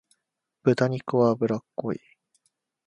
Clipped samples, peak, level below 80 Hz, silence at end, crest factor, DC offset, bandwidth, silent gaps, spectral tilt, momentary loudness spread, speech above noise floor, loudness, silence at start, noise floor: under 0.1%; -6 dBFS; -68 dBFS; 0.9 s; 20 dB; under 0.1%; 11 kHz; none; -8 dB/octave; 10 LU; 56 dB; -25 LUFS; 0.65 s; -80 dBFS